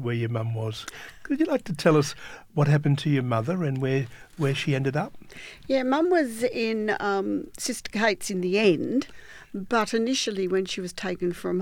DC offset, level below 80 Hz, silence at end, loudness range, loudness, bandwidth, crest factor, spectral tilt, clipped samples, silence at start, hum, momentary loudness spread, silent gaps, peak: under 0.1%; -58 dBFS; 0 s; 2 LU; -26 LUFS; 17 kHz; 20 dB; -5.5 dB/octave; under 0.1%; 0 s; none; 14 LU; none; -6 dBFS